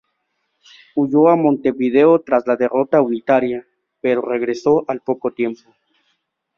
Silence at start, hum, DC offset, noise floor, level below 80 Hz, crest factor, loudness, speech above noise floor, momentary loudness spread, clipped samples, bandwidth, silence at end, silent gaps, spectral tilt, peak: 0.95 s; none; under 0.1%; -71 dBFS; -62 dBFS; 16 dB; -17 LUFS; 55 dB; 11 LU; under 0.1%; 7 kHz; 1 s; none; -8 dB/octave; -2 dBFS